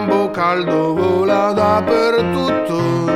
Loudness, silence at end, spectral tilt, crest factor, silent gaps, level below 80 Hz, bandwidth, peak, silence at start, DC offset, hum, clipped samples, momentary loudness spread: -16 LUFS; 0 s; -6.5 dB/octave; 12 dB; none; -48 dBFS; 15 kHz; -2 dBFS; 0 s; under 0.1%; none; under 0.1%; 3 LU